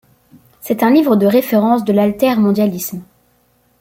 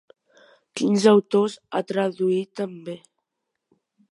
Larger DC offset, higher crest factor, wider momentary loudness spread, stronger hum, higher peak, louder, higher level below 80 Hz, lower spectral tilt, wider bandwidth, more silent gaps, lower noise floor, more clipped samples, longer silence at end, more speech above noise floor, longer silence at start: neither; second, 14 dB vs 20 dB; second, 13 LU vs 20 LU; neither; about the same, -2 dBFS vs -4 dBFS; first, -14 LUFS vs -22 LUFS; first, -56 dBFS vs -76 dBFS; about the same, -6.5 dB/octave vs -6 dB/octave; first, 16.5 kHz vs 11.5 kHz; neither; second, -57 dBFS vs -81 dBFS; neither; second, 0.75 s vs 1.15 s; second, 44 dB vs 59 dB; about the same, 0.65 s vs 0.75 s